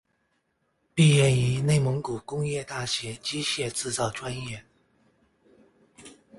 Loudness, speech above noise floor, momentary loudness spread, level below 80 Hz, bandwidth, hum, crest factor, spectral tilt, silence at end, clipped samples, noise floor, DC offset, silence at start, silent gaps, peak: -26 LUFS; 48 dB; 14 LU; -56 dBFS; 11.5 kHz; none; 20 dB; -5 dB/octave; 0.25 s; under 0.1%; -73 dBFS; under 0.1%; 0.95 s; none; -8 dBFS